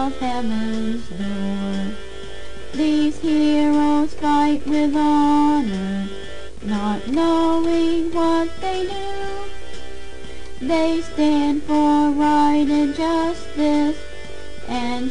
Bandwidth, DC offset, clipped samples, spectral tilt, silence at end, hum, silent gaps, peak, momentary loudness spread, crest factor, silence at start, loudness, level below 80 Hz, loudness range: 10 kHz; 5%; under 0.1%; -5.5 dB/octave; 0 s; none; none; -6 dBFS; 19 LU; 12 dB; 0 s; -20 LUFS; -40 dBFS; 5 LU